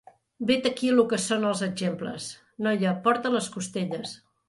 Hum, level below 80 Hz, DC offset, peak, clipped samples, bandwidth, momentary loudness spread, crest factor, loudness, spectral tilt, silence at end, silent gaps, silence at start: none; -68 dBFS; under 0.1%; -8 dBFS; under 0.1%; 11.5 kHz; 12 LU; 18 dB; -26 LUFS; -4.5 dB/octave; 0.3 s; none; 0.4 s